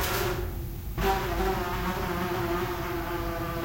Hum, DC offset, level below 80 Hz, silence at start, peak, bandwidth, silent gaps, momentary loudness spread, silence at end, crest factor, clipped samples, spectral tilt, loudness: none; 0.2%; -36 dBFS; 0 s; -12 dBFS; 16.5 kHz; none; 5 LU; 0 s; 16 dB; under 0.1%; -5 dB/octave; -30 LUFS